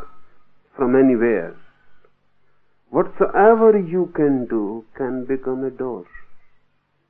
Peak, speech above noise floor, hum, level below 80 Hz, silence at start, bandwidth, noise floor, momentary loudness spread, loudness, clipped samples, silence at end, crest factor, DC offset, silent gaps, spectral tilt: -2 dBFS; 47 dB; none; -56 dBFS; 0 s; 3.3 kHz; -64 dBFS; 15 LU; -19 LUFS; under 0.1%; 0.65 s; 18 dB; under 0.1%; none; -12 dB/octave